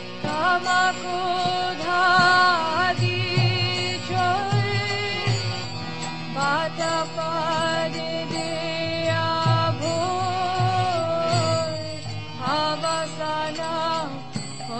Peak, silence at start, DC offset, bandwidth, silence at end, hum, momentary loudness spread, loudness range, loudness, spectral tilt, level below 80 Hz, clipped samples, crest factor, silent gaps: -6 dBFS; 0 s; 1%; 8.8 kHz; 0 s; none; 9 LU; 5 LU; -23 LUFS; -4.5 dB/octave; -54 dBFS; under 0.1%; 18 dB; none